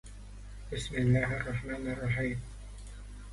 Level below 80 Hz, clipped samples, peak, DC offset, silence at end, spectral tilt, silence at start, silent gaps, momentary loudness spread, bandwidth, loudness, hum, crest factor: -46 dBFS; under 0.1%; -14 dBFS; under 0.1%; 0 s; -6.5 dB/octave; 0.05 s; none; 20 LU; 11.5 kHz; -33 LUFS; 50 Hz at -45 dBFS; 20 dB